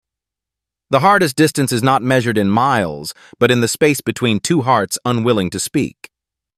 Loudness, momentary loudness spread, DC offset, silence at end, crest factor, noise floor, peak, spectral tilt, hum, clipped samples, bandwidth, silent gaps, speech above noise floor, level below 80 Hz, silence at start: -16 LUFS; 7 LU; under 0.1%; 0.7 s; 16 dB; -85 dBFS; -2 dBFS; -5 dB/octave; none; under 0.1%; 16 kHz; none; 69 dB; -52 dBFS; 0.9 s